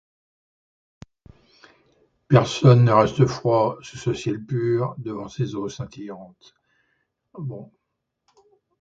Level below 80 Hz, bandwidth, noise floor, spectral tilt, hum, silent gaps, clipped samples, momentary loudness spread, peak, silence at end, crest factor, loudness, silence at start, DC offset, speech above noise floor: -54 dBFS; 7.8 kHz; -79 dBFS; -7.5 dB/octave; none; none; under 0.1%; 19 LU; 0 dBFS; 1.15 s; 22 dB; -21 LUFS; 2.3 s; under 0.1%; 58 dB